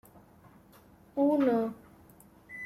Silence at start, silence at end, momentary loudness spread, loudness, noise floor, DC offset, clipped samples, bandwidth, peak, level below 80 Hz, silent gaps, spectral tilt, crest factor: 1.15 s; 0 s; 21 LU; -29 LUFS; -58 dBFS; under 0.1%; under 0.1%; 14 kHz; -16 dBFS; -70 dBFS; none; -7.5 dB/octave; 18 dB